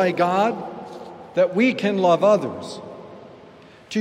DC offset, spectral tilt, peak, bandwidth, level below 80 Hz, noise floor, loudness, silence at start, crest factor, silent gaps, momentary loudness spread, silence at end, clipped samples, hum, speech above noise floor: under 0.1%; -6 dB/octave; -6 dBFS; 12.5 kHz; -70 dBFS; -46 dBFS; -20 LUFS; 0 s; 16 dB; none; 21 LU; 0 s; under 0.1%; none; 27 dB